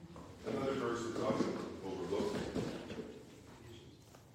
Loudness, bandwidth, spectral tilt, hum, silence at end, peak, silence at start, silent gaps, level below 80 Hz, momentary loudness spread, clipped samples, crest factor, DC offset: -40 LUFS; 16.5 kHz; -6 dB/octave; none; 0 s; -22 dBFS; 0 s; none; -64 dBFS; 18 LU; under 0.1%; 20 dB; under 0.1%